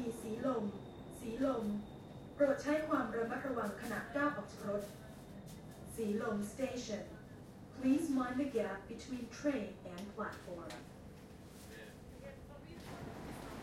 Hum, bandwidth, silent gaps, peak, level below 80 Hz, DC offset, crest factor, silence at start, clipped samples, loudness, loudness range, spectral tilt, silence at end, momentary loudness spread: none; 16.5 kHz; none; -20 dBFS; -64 dBFS; under 0.1%; 20 dB; 0 s; under 0.1%; -40 LUFS; 10 LU; -6 dB/octave; 0 s; 18 LU